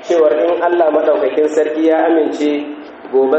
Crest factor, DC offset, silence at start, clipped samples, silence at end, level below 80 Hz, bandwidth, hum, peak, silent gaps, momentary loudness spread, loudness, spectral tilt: 12 dB; under 0.1%; 0 s; under 0.1%; 0 s; -64 dBFS; 8.2 kHz; none; -2 dBFS; none; 6 LU; -14 LUFS; -4.5 dB/octave